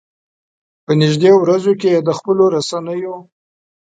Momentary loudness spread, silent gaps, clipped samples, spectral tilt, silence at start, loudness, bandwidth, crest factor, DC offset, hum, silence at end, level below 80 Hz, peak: 13 LU; none; under 0.1%; -6.5 dB/octave; 0.9 s; -14 LUFS; 9.2 kHz; 14 dB; under 0.1%; none; 0.7 s; -62 dBFS; 0 dBFS